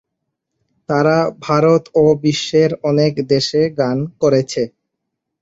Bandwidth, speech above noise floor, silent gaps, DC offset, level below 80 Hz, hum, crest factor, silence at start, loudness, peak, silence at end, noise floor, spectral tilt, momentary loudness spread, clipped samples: 8 kHz; 62 dB; none; under 0.1%; -54 dBFS; none; 14 dB; 0.9 s; -16 LUFS; -2 dBFS; 0.75 s; -77 dBFS; -6 dB/octave; 6 LU; under 0.1%